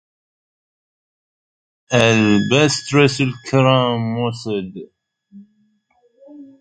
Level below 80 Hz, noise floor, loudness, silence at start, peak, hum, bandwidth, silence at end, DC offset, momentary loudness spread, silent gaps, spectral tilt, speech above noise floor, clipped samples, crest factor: -54 dBFS; -61 dBFS; -16 LUFS; 1.9 s; 0 dBFS; none; 10 kHz; 0.15 s; under 0.1%; 11 LU; none; -5 dB/octave; 45 dB; under 0.1%; 20 dB